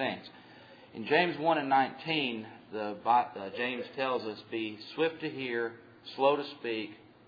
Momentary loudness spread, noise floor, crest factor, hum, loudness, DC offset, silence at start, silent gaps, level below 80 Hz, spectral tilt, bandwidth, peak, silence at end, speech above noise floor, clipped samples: 15 LU; -54 dBFS; 20 dB; none; -32 LUFS; under 0.1%; 0 s; none; -80 dBFS; -7 dB/octave; 5 kHz; -12 dBFS; 0.3 s; 22 dB; under 0.1%